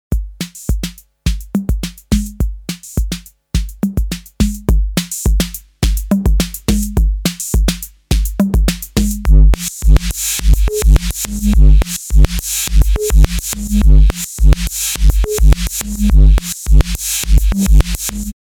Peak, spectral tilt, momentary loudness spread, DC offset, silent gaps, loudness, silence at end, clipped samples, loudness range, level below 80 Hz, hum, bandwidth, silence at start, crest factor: 0 dBFS; -5 dB/octave; 10 LU; under 0.1%; none; -15 LUFS; 0.2 s; 0.3%; 6 LU; -14 dBFS; none; 18.5 kHz; 0.1 s; 12 dB